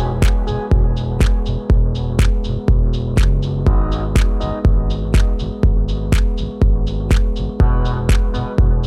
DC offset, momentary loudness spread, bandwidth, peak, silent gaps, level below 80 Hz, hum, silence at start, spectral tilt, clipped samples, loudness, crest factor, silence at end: under 0.1%; 3 LU; 12 kHz; -2 dBFS; none; -16 dBFS; none; 0 s; -7 dB/octave; under 0.1%; -18 LUFS; 12 dB; 0 s